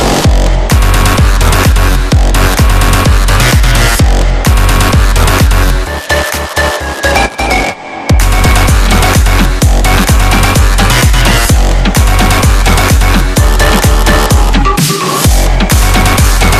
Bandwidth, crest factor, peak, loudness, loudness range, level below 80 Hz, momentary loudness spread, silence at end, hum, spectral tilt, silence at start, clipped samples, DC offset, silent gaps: 14.5 kHz; 6 dB; 0 dBFS; -9 LUFS; 2 LU; -10 dBFS; 4 LU; 0 s; none; -4 dB/octave; 0 s; 0.4%; under 0.1%; none